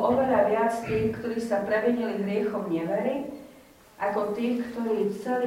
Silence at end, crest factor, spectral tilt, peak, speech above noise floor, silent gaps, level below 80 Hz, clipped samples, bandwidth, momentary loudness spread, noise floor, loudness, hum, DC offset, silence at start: 0 s; 16 dB; -7 dB/octave; -10 dBFS; 25 dB; none; -58 dBFS; under 0.1%; 16 kHz; 8 LU; -52 dBFS; -27 LUFS; none; under 0.1%; 0 s